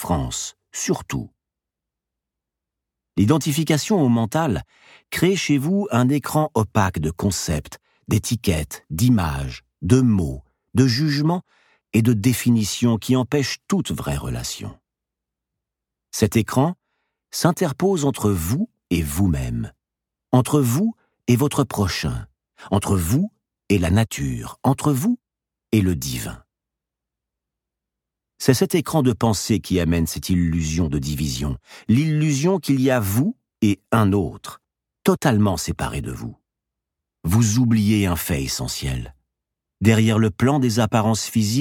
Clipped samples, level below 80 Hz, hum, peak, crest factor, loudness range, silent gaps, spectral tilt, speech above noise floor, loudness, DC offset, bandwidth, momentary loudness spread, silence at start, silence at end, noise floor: under 0.1%; -40 dBFS; none; -2 dBFS; 20 dB; 4 LU; none; -5.5 dB/octave; 67 dB; -21 LUFS; under 0.1%; 18.5 kHz; 11 LU; 0 s; 0 s; -86 dBFS